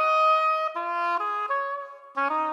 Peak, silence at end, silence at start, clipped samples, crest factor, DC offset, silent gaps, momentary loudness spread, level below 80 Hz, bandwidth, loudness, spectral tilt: -12 dBFS; 0 s; 0 s; under 0.1%; 12 dB; under 0.1%; none; 12 LU; under -90 dBFS; 11.5 kHz; -25 LUFS; -1 dB/octave